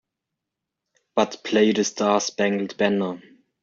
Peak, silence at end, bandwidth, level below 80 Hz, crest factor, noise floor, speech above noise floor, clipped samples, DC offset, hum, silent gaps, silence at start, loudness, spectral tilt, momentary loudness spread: -6 dBFS; 0.45 s; 7.6 kHz; -66 dBFS; 18 dB; -84 dBFS; 63 dB; under 0.1%; under 0.1%; none; none; 1.15 s; -22 LUFS; -4 dB/octave; 8 LU